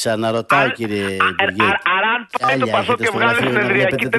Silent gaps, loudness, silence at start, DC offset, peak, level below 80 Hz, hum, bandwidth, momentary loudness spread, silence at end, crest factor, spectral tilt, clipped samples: none; -16 LUFS; 0 s; under 0.1%; 0 dBFS; -56 dBFS; none; 12.5 kHz; 4 LU; 0 s; 16 dB; -4.5 dB/octave; under 0.1%